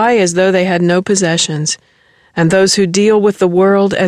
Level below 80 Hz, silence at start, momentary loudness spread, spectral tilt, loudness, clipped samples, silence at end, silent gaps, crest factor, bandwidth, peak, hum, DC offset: -50 dBFS; 0 s; 6 LU; -4.5 dB/octave; -12 LUFS; under 0.1%; 0 s; none; 10 dB; 12.5 kHz; -2 dBFS; none; under 0.1%